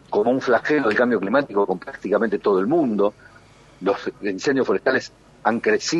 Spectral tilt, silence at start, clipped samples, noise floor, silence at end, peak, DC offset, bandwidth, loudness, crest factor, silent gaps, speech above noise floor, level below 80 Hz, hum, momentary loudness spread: -5 dB/octave; 0.1 s; under 0.1%; -49 dBFS; 0 s; -4 dBFS; under 0.1%; 8 kHz; -21 LUFS; 16 dB; none; 29 dB; -60 dBFS; none; 7 LU